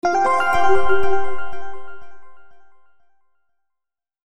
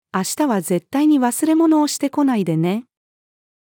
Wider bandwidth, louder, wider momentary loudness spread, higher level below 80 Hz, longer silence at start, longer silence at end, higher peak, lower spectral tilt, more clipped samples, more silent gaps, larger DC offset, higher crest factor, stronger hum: second, 13 kHz vs 18.5 kHz; about the same, -19 LUFS vs -18 LUFS; first, 21 LU vs 6 LU; first, -42 dBFS vs -74 dBFS; second, 0 s vs 0.15 s; second, 0.1 s vs 0.85 s; about the same, -2 dBFS vs -4 dBFS; about the same, -5 dB/octave vs -5.5 dB/octave; neither; neither; neither; about the same, 14 dB vs 14 dB; neither